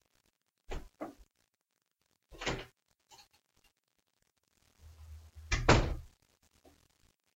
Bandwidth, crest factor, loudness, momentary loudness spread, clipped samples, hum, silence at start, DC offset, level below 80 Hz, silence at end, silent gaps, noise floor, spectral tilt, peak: 16 kHz; 30 dB; -33 LUFS; 27 LU; under 0.1%; none; 0.7 s; under 0.1%; -46 dBFS; 1.3 s; none; -84 dBFS; -5 dB/octave; -10 dBFS